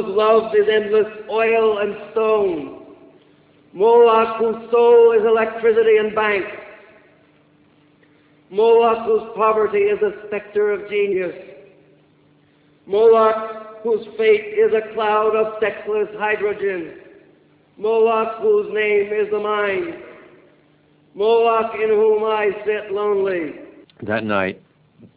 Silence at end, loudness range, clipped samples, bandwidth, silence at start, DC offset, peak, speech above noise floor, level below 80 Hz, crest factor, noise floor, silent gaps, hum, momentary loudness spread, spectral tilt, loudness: 0.1 s; 5 LU; under 0.1%; 4 kHz; 0 s; under 0.1%; -4 dBFS; 38 dB; -60 dBFS; 16 dB; -55 dBFS; none; none; 12 LU; -8.5 dB/octave; -18 LUFS